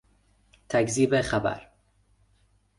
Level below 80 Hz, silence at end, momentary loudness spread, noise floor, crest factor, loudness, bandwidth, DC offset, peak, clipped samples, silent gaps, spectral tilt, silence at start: -54 dBFS; 1.15 s; 8 LU; -65 dBFS; 20 dB; -25 LUFS; 11.5 kHz; under 0.1%; -10 dBFS; under 0.1%; none; -5 dB/octave; 0.7 s